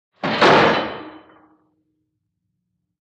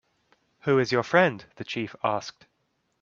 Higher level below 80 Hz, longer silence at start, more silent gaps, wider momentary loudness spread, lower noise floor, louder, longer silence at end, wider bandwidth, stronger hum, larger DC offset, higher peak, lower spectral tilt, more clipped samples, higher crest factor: first, -54 dBFS vs -70 dBFS; second, 0.25 s vs 0.65 s; neither; first, 17 LU vs 13 LU; about the same, -75 dBFS vs -74 dBFS; first, -15 LUFS vs -25 LUFS; first, 1.9 s vs 0.7 s; first, 9.8 kHz vs 7.4 kHz; neither; neither; about the same, -2 dBFS vs -4 dBFS; about the same, -5 dB/octave vs -5.5 dB/octave; neither; about the same, 20 dB vs 24 dB